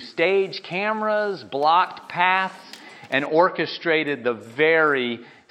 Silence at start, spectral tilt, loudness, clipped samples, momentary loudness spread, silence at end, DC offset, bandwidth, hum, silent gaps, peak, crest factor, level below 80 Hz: 0 s; -5.5 dB/octave; -21 LUFS; under 0.1%; 10 LU; 0.25 s; under 0.1%; 10.5 kHz; none; none; -4 dBFS; 18 dB; -82 dBFS